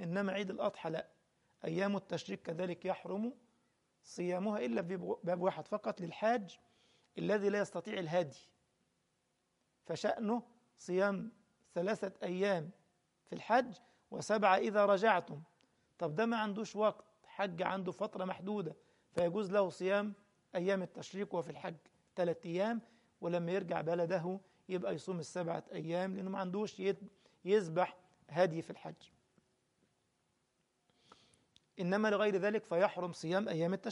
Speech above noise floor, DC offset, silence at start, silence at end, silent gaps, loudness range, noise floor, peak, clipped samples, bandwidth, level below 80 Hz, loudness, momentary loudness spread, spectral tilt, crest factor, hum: 45 dB; under 0.1%; 0 s; 0 s; none; 6 LU; -81 dBFS; -16 dBFS; under 0.1%; 11.5 kHz; -82 dBFS; -37 LUFS; 13 LU; -6 dB/octave; 22 dB; none